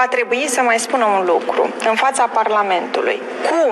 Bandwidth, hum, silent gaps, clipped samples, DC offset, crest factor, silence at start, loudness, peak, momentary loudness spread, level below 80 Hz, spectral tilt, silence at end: 13 kHz; none; none; under 0.1%; under 0.1%; 12 dB; 0 s; -16 LUFS; -4 dBFS; 4 LU; -76 dBFS; -2 dB/octave; 0 s